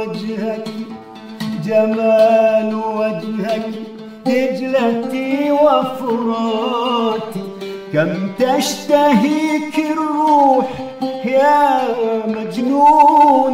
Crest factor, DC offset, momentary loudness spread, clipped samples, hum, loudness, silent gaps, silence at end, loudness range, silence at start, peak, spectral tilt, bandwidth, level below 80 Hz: 14 dB; under 0.1%; 14 LU; under 0.1%; none; -15 LUFS; none; 0 s; 3 LU; 0 s; 0 dBFS; -5.5 dB/octave; 16 kHz; -60 dBFS